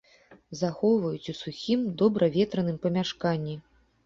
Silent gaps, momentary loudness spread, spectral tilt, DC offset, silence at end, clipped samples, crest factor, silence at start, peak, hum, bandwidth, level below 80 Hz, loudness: none; 12 LU; -7 dB/octave; under 0.1%; 0.45 s; under 0.1%; 18 dB; 0.3 s; -10 dBFS; none; 7.6 kHz; -62 dBFS; -27 LUFS